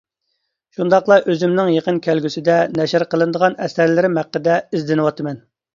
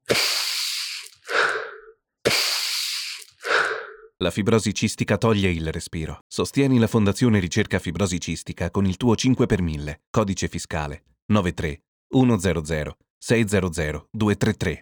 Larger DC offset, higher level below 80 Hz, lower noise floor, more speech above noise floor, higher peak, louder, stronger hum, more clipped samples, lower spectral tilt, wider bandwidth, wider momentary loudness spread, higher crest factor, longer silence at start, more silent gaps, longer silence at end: neither; second, -62 dBFS vs -42 dBFS; first, -72 dBFS vs -49 dBFS; first, 56 dB vs 27 dB; first, 0 dBFS vs -4 dBFS; first, -17 LUFS vs -23 LUFS; neither; neither; first, -6.5 dB/octave vs -4.5 dB/octave; second, 7.4 kHz vs over 20 kHz; second, 7 LU vs 11 LU; about the same, 16 dB vs 18 dB; first, 0.8 s vs 0.1 s; second, none vs 6.21-6.30 s, 10.07-10.14 s, 11.22-11.29 s, 11.88-12.10 s, 13.10-13.21 s; first, 0.4 s vs 0 s